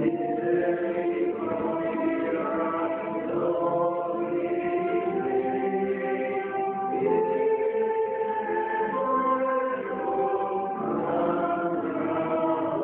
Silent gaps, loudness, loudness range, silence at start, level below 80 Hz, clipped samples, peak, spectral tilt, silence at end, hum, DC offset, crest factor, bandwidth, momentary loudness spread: none; -27 LUFS; 1 LU; 0 s; -66 dBFS; under 0.1%; -12 dBFS; -6 dB/octave; 0 s; none; under 0.1%; 14 dB; 3.9 kHz; 4 LU